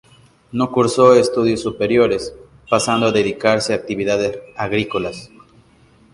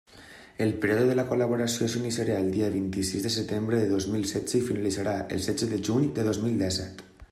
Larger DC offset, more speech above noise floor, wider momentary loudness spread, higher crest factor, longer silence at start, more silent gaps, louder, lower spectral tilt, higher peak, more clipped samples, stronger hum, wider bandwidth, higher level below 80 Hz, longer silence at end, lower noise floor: neither; first, 34 dB vs 23 dB; first, 12 LU vs 5 LU; about the same, 18 dB vs 16 dB; first, 0.55 s vs 0.15 s; neither; first, -17 LUFS vs -27 LUFS; about the same, -5 dB/octave vs -5 dB/octave; first, 0 dBFS vs -12 dBFS; neither; neither; second, 11.5 kHz vs 15 kHz; first, -50 dBFS vs -58 dBFS; first, 0.85 s vs 0.05 s; about the same, -51 dBFS vs -50 dBFS